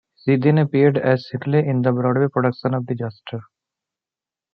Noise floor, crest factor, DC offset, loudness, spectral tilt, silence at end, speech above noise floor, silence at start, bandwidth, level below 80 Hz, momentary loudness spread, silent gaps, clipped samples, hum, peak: -90 dBFS; 18 dB; under 0.1%; -19 LUFS; -10.5 dB/octave; 1.1 s; 71 dB; 0.25 s; 5.6 kHz; -66 dBFS; 12 LU; none; under 0.1%; none; -2 dBFS